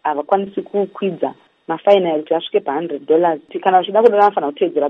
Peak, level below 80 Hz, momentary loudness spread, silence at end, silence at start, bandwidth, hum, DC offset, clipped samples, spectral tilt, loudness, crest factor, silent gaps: 0 dBFS; -70 dBFS; 10 LU; 0 s; 0.05 s; 5.8 kHz; none; under 0.1%; under 0.1%; -7.5 dB/octave; -17 LUFS; 16 dB; none